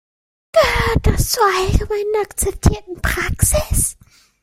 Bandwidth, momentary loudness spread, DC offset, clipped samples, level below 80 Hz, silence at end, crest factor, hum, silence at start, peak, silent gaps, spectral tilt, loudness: 16.5 kHz; 6 LU; under 0.1%; under 0.1%; -24 dBFS; 0.5 s; 18 dB; none; 0.55 s; 0 dBFS; none; -4 dB/octave; -17 LUFS